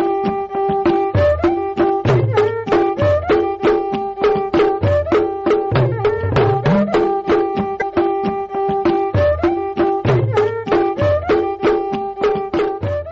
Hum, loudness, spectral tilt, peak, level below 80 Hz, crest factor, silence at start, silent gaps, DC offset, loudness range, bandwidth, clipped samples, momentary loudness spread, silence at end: none; -17 LUFS; -6.5 dB/octave; -6 dBFS; -38 dBFS; 10 dB; 0 s; none; under 0.1%; 1 LU; 7.4 kHz; under 0.1%; 5 LU; 0 s